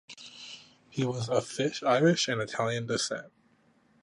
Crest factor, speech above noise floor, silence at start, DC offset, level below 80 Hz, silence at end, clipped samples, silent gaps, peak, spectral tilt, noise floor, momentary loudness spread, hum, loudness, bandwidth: 20 dB; 37 dB; 0.1 s; under 0.1%; -70 dBFS; 0.75 s; under 0.1%; none; -12 dBFS; -4.5 dB/octave; -66 dBFS; 20 LU; none; -29 LUFS; 11.5 kHz